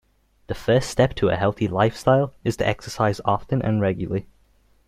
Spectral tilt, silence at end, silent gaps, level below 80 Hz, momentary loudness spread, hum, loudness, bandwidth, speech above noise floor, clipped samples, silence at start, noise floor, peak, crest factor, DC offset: -6.5 dB/octave; 0.65 s; none; -44 dBFS; 8 LU; none; -22 LUFS; 15 kHz; 38 dB; under 0.1%; 0.5 s; -59 dBFS; -4 dBFS; 18 dB; under 0.1%